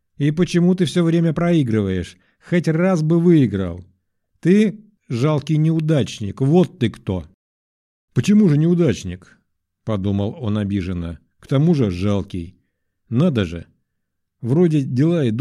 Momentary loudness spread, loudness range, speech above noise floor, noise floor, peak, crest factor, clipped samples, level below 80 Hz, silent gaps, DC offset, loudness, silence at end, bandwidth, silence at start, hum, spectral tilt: 13 LU; 4 LU; 57 dB; -74 dBFS; -2 dBFS; 16 dB; under 0.1%; -48 dBFS; 7.34-8.08 s; under 0.1%; -19 LUFS; 0 s; 11.5 kHz; 0.2 s; none; -8 dB/octave